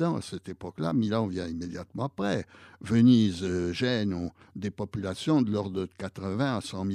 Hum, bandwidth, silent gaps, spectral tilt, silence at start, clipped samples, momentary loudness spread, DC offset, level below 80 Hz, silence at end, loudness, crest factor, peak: none; 11 kHz; none; -6.5 dB/octave; 0 s; under 0.1%; 15 LU; under 0.1%; -58 dBFS; 0 s; -29 LUFS; 18 dB; -10 dBFS